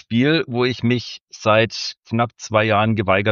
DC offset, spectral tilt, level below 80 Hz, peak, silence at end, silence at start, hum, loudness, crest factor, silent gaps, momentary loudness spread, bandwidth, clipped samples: under 0.1%; -5.5 dB/octave; -56 dBFS; -2 dBFS; 0 s; 0.1 s; none; -19 LUFS; 18 dB; 1.23-1.28 s, 1.97-2.01 s; 7 LU; 7.4 kHz; under 0.1%